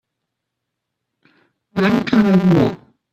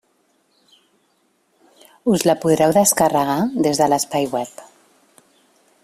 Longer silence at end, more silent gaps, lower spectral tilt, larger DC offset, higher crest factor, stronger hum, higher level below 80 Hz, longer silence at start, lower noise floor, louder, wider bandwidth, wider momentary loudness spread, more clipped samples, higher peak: second, 0.35 s vs 1.2 s; neither; first, -8 dB/octave vs -4.5 dB/octave; neither; about the same, 18 dB vs 20 dB; neither; first, -50 dBFS vs -58 dBFS; second, 1.75 s vs 2.05 s; first, -78 dBFS vs -64 dBFS; about the same, -15 LUFS vs -17 LUFS; second, 7.8 kHz vs 16 kHz; about the same, 12 LU vs 10 LU; neither; about the same, 0 dBFS vs -2 dBFS